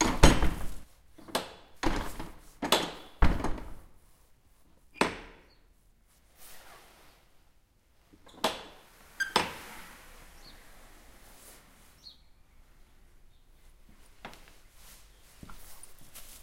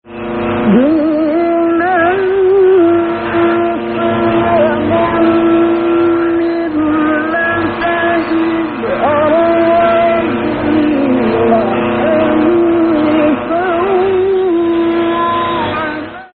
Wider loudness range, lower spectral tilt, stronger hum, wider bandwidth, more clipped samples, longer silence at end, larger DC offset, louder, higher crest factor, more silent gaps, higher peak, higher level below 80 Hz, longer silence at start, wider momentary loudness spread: first, 22 LU vs 2 LU; about the same, -4 dB/octave vs -4.5 dB/octave; neither; first, 16 kHz vs 4.6 kHz; neither; about the same, 0.1 s vs 0.1 s; neither; second, -31 LUFS vs -12 LUFS; first, 32 dB vs 12 dB; neither; about the same, -2 dBFS vs 0 dBFS; about the same, -38 dBFS vs -42 dBFS; about the same, 0 s vs 0.05 s; first, 26 LU vs 5 LU